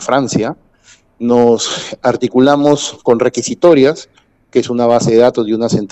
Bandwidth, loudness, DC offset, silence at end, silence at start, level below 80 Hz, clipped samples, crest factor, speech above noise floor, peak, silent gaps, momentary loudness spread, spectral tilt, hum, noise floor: 8.4 kHz; -12 LUFS; under 0.1%; 0.05 s; 0 s; -50 dBFS; under 0.1%; 12 dB; 36 dB; 0 dBFS; none; 8 LU; -5 dB/octave; none; -48 dBFS